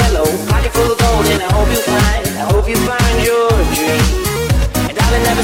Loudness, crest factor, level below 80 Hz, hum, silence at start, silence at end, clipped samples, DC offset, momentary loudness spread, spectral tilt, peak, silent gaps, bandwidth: -14 LUFS; 8 dB; -18 dBFS; none; 0 s; 0 s; under 0.1%; under 0.1%; 3 LU; -4.5 dB/octave; -4 dBFS; none; 17 kHz